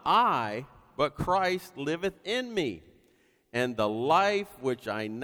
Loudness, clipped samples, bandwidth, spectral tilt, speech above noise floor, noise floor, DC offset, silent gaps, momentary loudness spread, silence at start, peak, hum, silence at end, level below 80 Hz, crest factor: -29 LUFS; under 0.1%; over 20 kHz; -5 dB/octave; 38 dB; -66 dBFS; under 0.1%; none; 11 LU; 0.05 s; -12 dBFS; none; 0 s; -58 dBFS; 18 dB